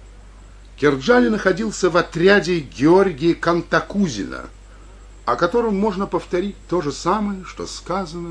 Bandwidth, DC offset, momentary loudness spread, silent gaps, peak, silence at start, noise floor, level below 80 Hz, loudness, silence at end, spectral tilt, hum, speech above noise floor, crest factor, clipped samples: 10.5 kHz; under 0.1%; 13 LU; none; -2 dBFS; 0 s; -41 dBFS; -42 dBFS; -19 LUFS; 0 s; -5.5 dB/octave; none; 23 dB; 18 dB; under 0.1%